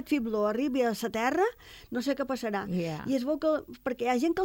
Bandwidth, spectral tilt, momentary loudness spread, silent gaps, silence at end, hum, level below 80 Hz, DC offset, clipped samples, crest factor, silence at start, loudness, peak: 17 kHz; -5.5 dB/octave; 5 LU; none; 0 s; none; -60 dBFS; under 0.1%; under 0.1%; 16 dB; 0 s; -30 LUFS; -14 dBFS